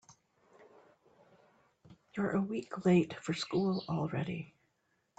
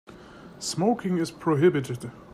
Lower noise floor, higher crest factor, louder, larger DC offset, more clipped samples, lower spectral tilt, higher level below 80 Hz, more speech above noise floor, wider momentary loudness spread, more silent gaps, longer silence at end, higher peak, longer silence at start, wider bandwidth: first, -78 dBFS vs -46 dBFS; about the same, 20 dB vs 18 dB; second, -34 LUFS vs -25 LUFS; neither; neither; about the same, -7 dB/octave vs -6 dB/octave; second, -72 dBFS vs -62 dBFS; first, 45 dB vs 21 dB; about the same, 13 LU vs 13 LU; neither; first, 0.7 s vs 0.1 s; second, -18 dBFS vs -10 dBFS; about the same, 0.1 s vs 0.1 s; second, 8.8 kHz vs 14.5 kHz